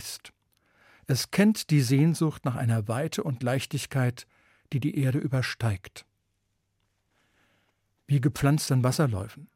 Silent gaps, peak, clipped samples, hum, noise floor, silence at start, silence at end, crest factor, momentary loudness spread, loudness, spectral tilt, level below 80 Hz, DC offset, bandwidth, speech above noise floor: none; -12 dBFS; under 0.1%; none; -76 dBFS; 0 s; 0.1 s; 16 dB; 10 LU; -27 LUFS; -6 dB/octave; -60 dBFS; under 0.1%; 16.5 kHz; 50 dB